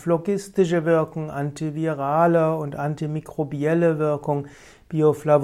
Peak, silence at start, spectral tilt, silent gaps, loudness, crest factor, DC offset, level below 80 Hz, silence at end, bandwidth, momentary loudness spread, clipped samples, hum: -4 dBFS; 0 s; -8 dB/octave; none; -23 LUFS; 16 dB; under 0.1%; -58 dBFS; 0 s; 14 kHz; 10 LU; under 0.1%; none